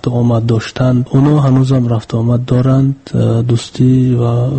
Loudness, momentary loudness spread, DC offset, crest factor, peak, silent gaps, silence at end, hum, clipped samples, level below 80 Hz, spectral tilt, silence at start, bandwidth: -12 LUFS; 5 LU; under 0.1%; 12 dB; 0 dBFS; none; 0 s; none; under 0.1%; -38 dBFS; -8.5 dB/octave; 0.05 s; 8.6 kHz